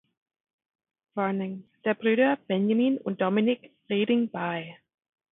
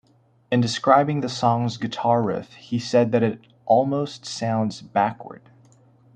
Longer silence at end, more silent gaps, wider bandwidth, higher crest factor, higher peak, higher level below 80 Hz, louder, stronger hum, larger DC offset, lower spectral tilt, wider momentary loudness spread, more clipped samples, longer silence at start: second, 0.55 s vs 0.8 s; neither; second, 4 kHz vs 9.4 kHz; about the same, 18 dB vs 20 dB; second, -10 dBFS vs -2 dBFS; second, -76 dBFS vs -64 dBFS; second, -27 LUFS vs -22 LUFS; neither; neither; first, -10.5 dB/octave vs -6 dB/octave; about the same, 10 LU vs 11 LU; neither; first, 1.15 s vs 0.5 s